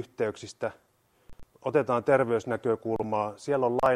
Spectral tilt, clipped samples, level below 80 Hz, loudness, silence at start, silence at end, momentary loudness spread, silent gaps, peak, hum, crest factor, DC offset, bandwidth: -6.5 dB/octave; under 0.1%; -60 dBFS; -28 LUFS; 0 s; 0 s; 11 LU; none; -10 dBFS; none; 18 dB; under 0.1%; 12.5 kHz